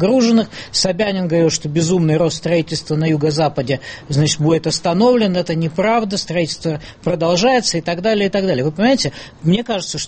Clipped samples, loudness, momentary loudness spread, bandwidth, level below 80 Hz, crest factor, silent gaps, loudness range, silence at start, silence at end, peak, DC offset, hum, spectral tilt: under 0.1%; -17 LUFS; 8 LU; 8.8 kHz; -46 dBFS; 14 dB; none; 1 LU; 0 s; 0 s; -2 dBFS; under 0.1%; none; -5 dB/octave